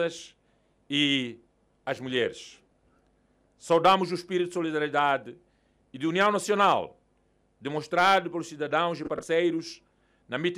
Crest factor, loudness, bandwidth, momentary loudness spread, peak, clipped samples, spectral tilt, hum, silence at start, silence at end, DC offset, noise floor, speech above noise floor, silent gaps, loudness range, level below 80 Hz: 18 dB; -26 LUFS; 15.5 kHz; 18 LU; -10 dBFS; under 0.1%; -4.5 dB/octave; none; 0 s; 0 s; under 0.1%; -68 dBFS; 42 dB; none; 4 LU; -70 dBFS